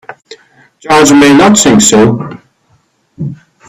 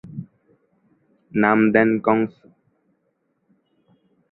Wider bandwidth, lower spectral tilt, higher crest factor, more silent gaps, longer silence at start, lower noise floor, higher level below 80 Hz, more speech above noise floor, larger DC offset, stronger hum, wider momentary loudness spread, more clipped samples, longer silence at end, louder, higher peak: first, over 20 kHz vs 4.1 kHz; second, -4 dB/octave vs -11 dB/octave; second, 8 dB vs 22 dB; neither; about the same, 0.1 s vs 0.05 s; second, -53 dBFS vs -70 dBFS; first, -42 dBFS vs -64 dBFS; second, 48 dB vs 52 dB; neither; neither; about the same, 18 LU vs 18 LU; first, 0.3% vs under 0.1%; second, 0.35 s vs 2.05 s; first, -5 LUFS vs -19 LUFS; about the same, 0 dBFS vs -2 dBFS